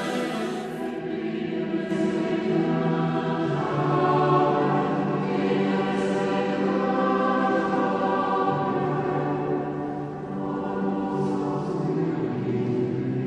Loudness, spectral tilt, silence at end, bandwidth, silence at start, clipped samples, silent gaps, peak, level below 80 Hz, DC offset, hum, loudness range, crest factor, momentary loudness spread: -25 LUFS; -7.5 dB/octave; 0 s; 11.5 kHz; 0 s; under 0.1%; none; -10 dBFS; -60 dBFS; under 0.1%; none; 4 LU; 14 dB; 8 LU